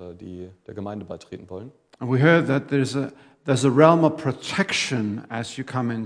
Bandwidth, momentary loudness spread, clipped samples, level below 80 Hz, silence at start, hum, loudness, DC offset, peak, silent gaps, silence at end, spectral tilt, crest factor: 10.5 kHz; 22 LU; under 0.1%; -66 dBFS; 0 s; none; -21 LUFS; under 0.1%; 0 dBFS; none; 0 s; -6 dB/octave; 22 dB